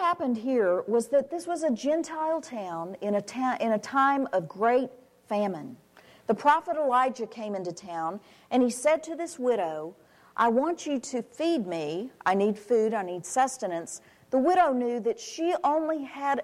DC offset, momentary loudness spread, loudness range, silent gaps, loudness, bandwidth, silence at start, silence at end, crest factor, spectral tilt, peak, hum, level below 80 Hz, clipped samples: under 0.1%; 11 LU; 2 LU; none; -28 LUFS; 14.5 kHz; 0 s; 0 s; 18 dB; -4.5 dB/octave; -10 dBFS; none; -72 dBFS; under 0.1%